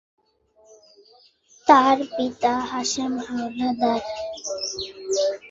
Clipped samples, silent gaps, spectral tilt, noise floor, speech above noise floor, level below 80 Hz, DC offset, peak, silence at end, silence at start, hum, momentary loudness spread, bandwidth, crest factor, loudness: under 0.1%; none; -2.5 dB/octave; -60 dBFS; 37 dB; -60 dBFS; under 0.1%; -2 dBFS; 0 s; 1.65 s; none; 14 LU; 7.8 kHz; 22 dB; -23 LUFS